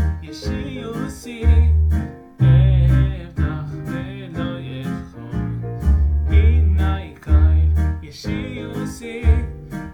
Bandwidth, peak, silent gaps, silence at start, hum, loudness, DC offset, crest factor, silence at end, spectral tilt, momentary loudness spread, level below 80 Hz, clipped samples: 8.8 kHz; -4 dBFS; none; 0 s; none; -20 LUFS; under 0.1%; 14 dB; 0 s; -8 dB/octave; 14 LU; -22 dBFS; under 0.1%